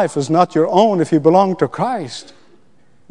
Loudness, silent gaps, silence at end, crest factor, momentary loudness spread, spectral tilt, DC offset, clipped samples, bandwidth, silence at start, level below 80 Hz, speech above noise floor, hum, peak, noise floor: -15 LUFS; none; 0.9 s; 16 dB; 12 LU; -6.5 dB/octave; 0.5%; under 0.1%; 10.5 kHz; 0 s; -66 dBFS; 41 dB; none; 0 dBFS; -56 dBFS